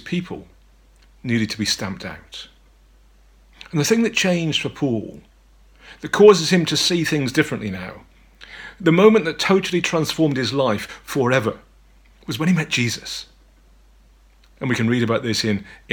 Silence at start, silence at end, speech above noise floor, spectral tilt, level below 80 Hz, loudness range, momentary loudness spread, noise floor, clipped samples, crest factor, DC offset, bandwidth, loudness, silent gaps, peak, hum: 0.05 s; 0 s; 33 dB; -4.5 dB/octave; -52 dBFS; 7 LU; 21 LU; -52 dBFS; under 0.1%; 20 dB; under 0.1%; 19 kHz; -19 LUFS; none; 0 dBFS; none